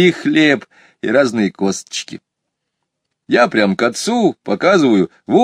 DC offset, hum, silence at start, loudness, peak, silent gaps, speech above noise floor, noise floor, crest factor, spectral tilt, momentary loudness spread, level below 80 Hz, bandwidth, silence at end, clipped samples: under 0.1%; none; 0 s; -15 LUFS; 0 dBFS; none; 61 dB; -76 dBFS; 16 dB; -5 dB/octave; 10 LU; -62 dBFS; 13.5 kHz; 0 s; under 0.1%